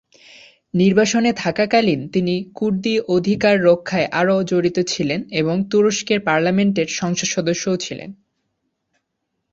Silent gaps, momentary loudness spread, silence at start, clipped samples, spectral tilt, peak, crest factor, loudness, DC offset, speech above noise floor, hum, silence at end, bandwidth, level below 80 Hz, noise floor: none; 7 LU; 0.75 s; under 0.1%; -5 dB/octave; -2 dBFS; 16 dB; -18 LUFS; under 0.1%; 57 dB; none; 1.4 s; 7.8 kHz; -56 dBFS; -75 dBFS